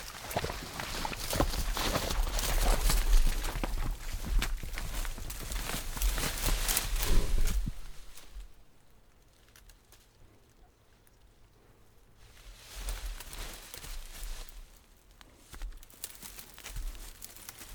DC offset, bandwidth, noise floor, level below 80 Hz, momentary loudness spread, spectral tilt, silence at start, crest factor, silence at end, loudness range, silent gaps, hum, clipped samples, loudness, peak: under 0.1%; over 20 kHz; -62 dBFS; -34 dBFS; 20 LU; -3 dB/octave; 0 s; 24 dB; 0 s; 14 LU; none; none; under 0.1%; -35 LUFS; -8 dBFS